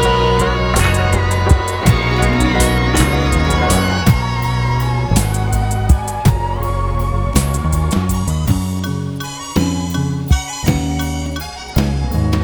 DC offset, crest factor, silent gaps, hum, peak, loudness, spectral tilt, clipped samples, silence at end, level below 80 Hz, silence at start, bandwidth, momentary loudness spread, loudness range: under 0.1%; 14 dB; none; none; 0 dBFS; -16 LUFS; -5.5 dB/octave; under 0.1%; 0 s; -20 dBFS; 0 s; over 20 kHz; 6 LU; 4 LU